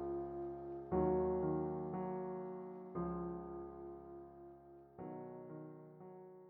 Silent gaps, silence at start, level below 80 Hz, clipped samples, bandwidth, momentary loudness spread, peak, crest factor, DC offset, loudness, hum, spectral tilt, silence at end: none; 0 s; -62 dBFS; under 0.1%; 3 kHz; 19 LU; -24 dBFS; 18 dB; under 0.1%; -43 LUFS; none; -11 dB/octave; 0 s